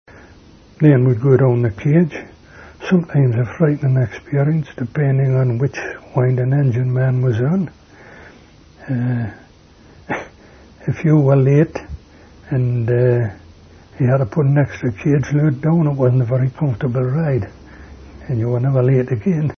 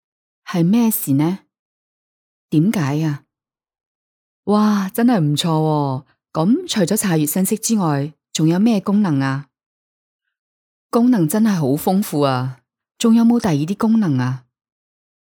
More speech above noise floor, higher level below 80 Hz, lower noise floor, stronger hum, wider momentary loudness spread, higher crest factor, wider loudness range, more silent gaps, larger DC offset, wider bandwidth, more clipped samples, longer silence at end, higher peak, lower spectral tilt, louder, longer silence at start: second, 30 dB vs 72 dB; first, -46 dBFS vs -62 dBFS; second, -46 dBFS vs -88 dBFS; neither; first, 12 LU vs 9 LU; about the same, 18 dB vs 16 dB; about the same, 4 LU vs 4 LU; second, none vs 1.59-2.49 s, 3.86-4.43 s, 9.66-10.19 s, 10.39-10.89 s; neither; second, 6.4 kHz vs over 20 kHz; neither; second, 0.05 s vs 0.8 s; about the same, 0 dBFS vs -2 dBFS; first, -9.5 dB/octave vs -6 dB/octave; about the same, -17 LUFS vs -17 LUFS; first, 0.8 s vs 0.45 s